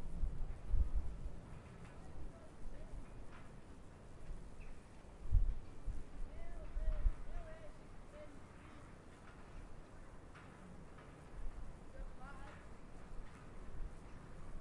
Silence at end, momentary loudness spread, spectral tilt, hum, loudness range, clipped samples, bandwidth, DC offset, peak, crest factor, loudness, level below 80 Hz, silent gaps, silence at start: 0 s; 15 LU; -7 dB/octave; none; 10 LU; under 0.1%; 10.5 kHz; under 0.1%; -20 dBFS; 22 dB; -51 LUFS; -46 dBFS; none; 0 s